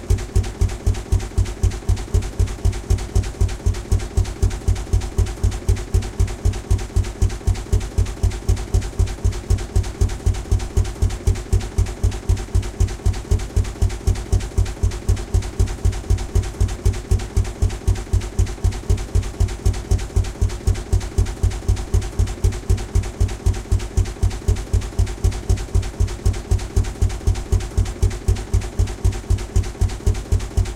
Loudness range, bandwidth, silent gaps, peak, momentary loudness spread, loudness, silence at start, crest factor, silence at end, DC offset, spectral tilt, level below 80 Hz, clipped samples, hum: 0 LU; 14 kHz; none; -6 dBFS; 3 LU; -23 LUFS; 0 s; 14 dB; 0 s; under 0.1%; -6 dB/octave; -22 dBFS; under 0.1%; none